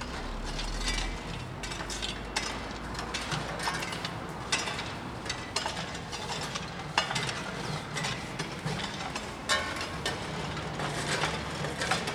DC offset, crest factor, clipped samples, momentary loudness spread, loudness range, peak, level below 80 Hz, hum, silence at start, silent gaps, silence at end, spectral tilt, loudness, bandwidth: under 0.1%; 26 dB; under 0.1%; 7 LU; 2 LU; -8 dBFS; -44 dBFS; none; 0 s; none; 0 s; -3 dB/octave; -33 LUFS; over 20 kHz